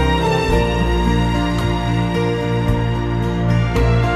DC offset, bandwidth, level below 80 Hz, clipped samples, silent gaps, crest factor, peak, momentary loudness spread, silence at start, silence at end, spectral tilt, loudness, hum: under 0.1%; 13 kHz; -22 dBFS; under 0.1%; none; 12 dB; -4 dBFS; 3 LU; 0 s; 0 s; -7 dB/octave; -18 LUFS; none